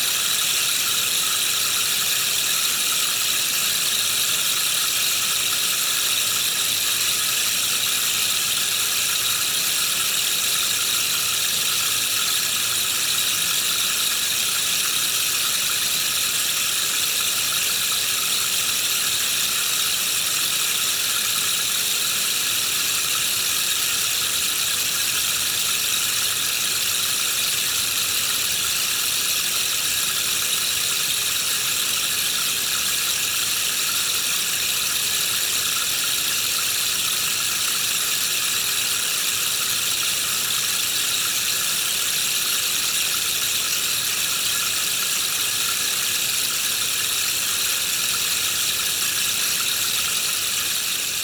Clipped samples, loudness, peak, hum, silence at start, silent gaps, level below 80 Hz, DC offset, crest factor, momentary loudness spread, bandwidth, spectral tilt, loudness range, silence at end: under 0.1%; -19 LUFS; -8 dBFS; none; 0 s; none; -58 dBFS; under 0.1%; 14 dB; 1 LU; over 20 kHz; 1.5 dB/octave; 1 LU; 0 s